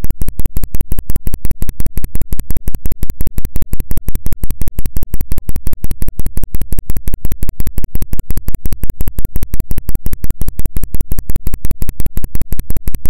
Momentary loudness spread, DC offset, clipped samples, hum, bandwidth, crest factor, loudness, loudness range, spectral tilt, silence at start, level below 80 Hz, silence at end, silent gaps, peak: 1 LU; under 0.1%; under 0.1%; none; 17 kHz; 6 dB; -24 LUFS; 0 LU; -6 dB/octave; 0 s; -18 dBFS; 0 s; none; 0 dBFS